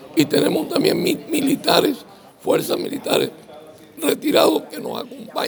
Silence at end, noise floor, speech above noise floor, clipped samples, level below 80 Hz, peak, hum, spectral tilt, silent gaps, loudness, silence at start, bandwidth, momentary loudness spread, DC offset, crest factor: 0 s; -42 dBFS; 23 dB; under 0.1%; -64 dBFS; 0 dBFS; none; -4 dB/octave; none; -19 LUFS; 0 s; over 20 kHz; 13 LU; under 0.1%; 20 dB